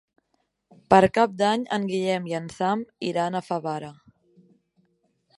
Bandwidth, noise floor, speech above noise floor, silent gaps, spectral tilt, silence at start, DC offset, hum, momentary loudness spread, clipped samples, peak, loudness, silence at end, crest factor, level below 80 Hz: 11.5 kHz; -74 dBFS; 50 dB; none; -6 dB/octave; 0.9 s; under 0.1%; none; 13 LU; under 0.1%; -2 dBFS; -24 LUFS; 1.45 s; 24 dB; -58 dBFS